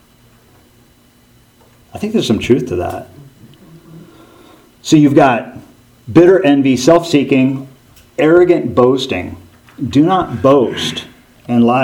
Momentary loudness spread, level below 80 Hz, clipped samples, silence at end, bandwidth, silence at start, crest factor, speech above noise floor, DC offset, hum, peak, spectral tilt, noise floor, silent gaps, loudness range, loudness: 17 LU; -48 dBFS; 0.1%; 0 s; 16.5 kHz; 1.95 s; 14 dB; 37 dB; under 0.1%; none; 0 dBFS; -6 dB/octave; -49 dBFS; none; 9 LU; -12 LUFS